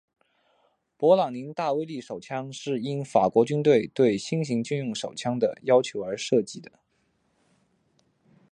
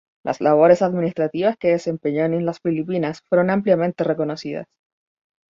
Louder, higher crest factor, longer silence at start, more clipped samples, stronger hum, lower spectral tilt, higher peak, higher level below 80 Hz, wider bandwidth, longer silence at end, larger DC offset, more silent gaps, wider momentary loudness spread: second, -25 LUFS vs -20 LUFS; about the same, 20 dB vs 18 dB; first, 1 s vs 0.25 s; neither; neither; second, -6 dB/octave vs -7.5 dB/octave; second, -6 dBFS vs -2 dBFS; second, -70 dBFS vs -62 dBFS; first, 9.8 kHz vs 7.6 kHz; first, 1.9 s vs 0.85 s; neither; neither; first, 13 LU vs 10 LU